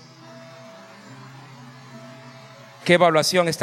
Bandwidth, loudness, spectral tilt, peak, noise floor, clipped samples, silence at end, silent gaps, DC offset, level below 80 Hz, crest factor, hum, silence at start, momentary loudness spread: 16.5 kHz; -18 LUFS; -4 dB/octave; -2 dBFS; -44 dBFS; under 0.1%; 0 s; none; under 0.1%; -72 dBFS; 22 dB; none; 0.35 s; 27 LU